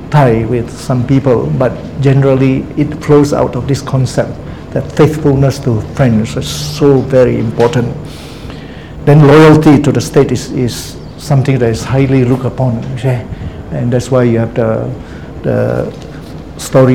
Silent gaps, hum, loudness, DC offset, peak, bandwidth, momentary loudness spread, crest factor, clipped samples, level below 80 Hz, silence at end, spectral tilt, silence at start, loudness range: none; none; -11 LUFS; 0.8%; 0 dBFS; 15 kHz; 16 LU; 10 dB; 1%; -32 dBFS; 0 s; -7 dB/octave; 0 s; 5 LU